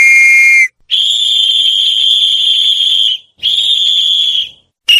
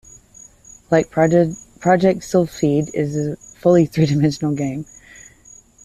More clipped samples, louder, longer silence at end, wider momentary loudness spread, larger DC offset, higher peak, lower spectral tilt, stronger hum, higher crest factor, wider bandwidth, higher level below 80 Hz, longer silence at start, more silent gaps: first, 0.2% vs under 0.1%; first, -7 LUFS vs -18 LUFS; second, 0 s vs 1 s; about the same, 8 LU vs 9 LU; neither; about the same, 0 dBFS vs -2 dBFS; second, 5 dB/octave vs -7 dB/octave; neither; second, 10 dB vs 16 dB; first, 16 kHz vs 14 kHz; second, -62 dBFS vs -50 dBFS; second, 0 s vs 0.9 s; neither